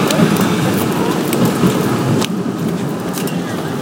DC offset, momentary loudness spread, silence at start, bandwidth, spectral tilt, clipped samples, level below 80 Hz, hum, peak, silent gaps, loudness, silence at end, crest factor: under 0.1%; 7 LU; 0 s; 17.5 kHz; -5.5 dB/octave; under 0.1%; -46 dBFS; none; 0 dBFS; none; -16 LUFS; 0 s; 16 dB